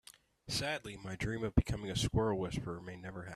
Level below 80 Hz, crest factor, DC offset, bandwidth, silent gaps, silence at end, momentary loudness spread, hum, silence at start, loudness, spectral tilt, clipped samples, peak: -48 dBFS; 24 dB; under 0.1%; 13.5 kHz; none; 0 s; 12 LU; none; 0.45 s; -37 LUFS; -5 dB/octave; under 0.1%; -12 dBFS